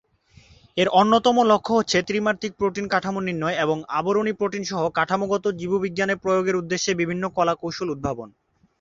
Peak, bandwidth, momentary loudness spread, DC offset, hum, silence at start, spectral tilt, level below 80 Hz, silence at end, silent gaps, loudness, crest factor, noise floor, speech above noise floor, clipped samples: -2 dBFS; 8 kHz; 9 LU; under 0.1%; none; 0.75 s; -4.5 dB/octave; -56 dBFS; 0.5 s; none; -22 LUFS; 20 dB; -54 dBFS; 32 dB; under 0.1%